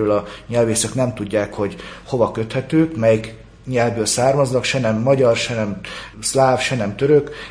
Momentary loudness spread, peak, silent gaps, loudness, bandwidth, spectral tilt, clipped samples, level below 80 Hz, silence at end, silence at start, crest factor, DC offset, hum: 10 LU; -2 dBFS; none; -18 LUFS; 10.5 kHz; -5 dB/octave; under 0.1%; -46 dBFS; 0 s; 0 s; 16 dB; under 0.1%; none